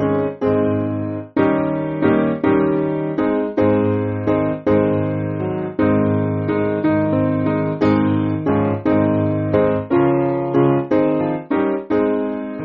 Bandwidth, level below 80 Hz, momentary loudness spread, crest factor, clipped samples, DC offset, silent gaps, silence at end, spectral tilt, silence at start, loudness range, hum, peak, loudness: 5.2 kHz; -48 dBFS; 4 LU; 14 dB; under 0.1%; under 0.1%; none; 0 s; -8 dB/octave; 0 s; 1 LU; none; -2 dBFS; -18 LUFS